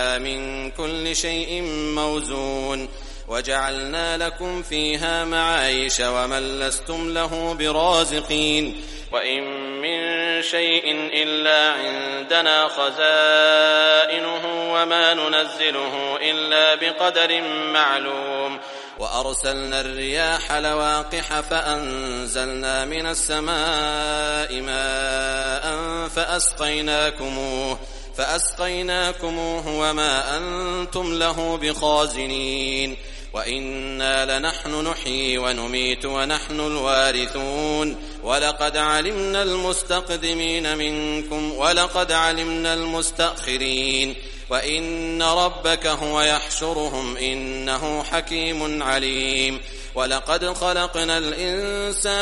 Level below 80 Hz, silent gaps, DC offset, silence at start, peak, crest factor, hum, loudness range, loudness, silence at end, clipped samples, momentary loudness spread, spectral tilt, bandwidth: -36 dBFS; none; under 0.1%; 0 s; -2 dBFS; 20 dB; none; 6 LU; -21 LUFS; 0 s; under 0.1%; 9 LU; -2 dB/octave; 11.5 kHz